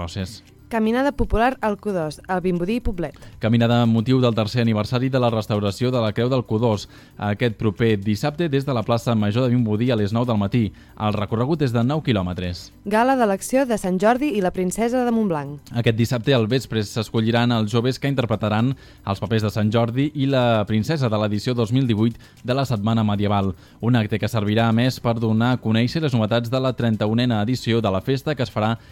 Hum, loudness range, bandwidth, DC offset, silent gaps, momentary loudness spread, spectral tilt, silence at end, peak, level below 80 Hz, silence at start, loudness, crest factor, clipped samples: none; 2 LU; 15.5 kHz; under 0.1%; none; 7 LU; -7 dB/octave; 0.15 s; -4 dBFS; -42 dBFS; 0 s; -21 LUFS; 16 dB; under 0.1%